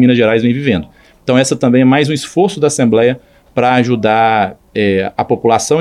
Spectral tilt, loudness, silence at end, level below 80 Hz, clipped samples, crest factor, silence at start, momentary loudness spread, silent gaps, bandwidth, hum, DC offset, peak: -5.5 dB/octave; -12 LUFS; 0 s; -48 dBFS; under 0.1%; 12 dB; 0 s; 6 LU; none; 12.5 kHz; none; under 0.1%; 0 dBFS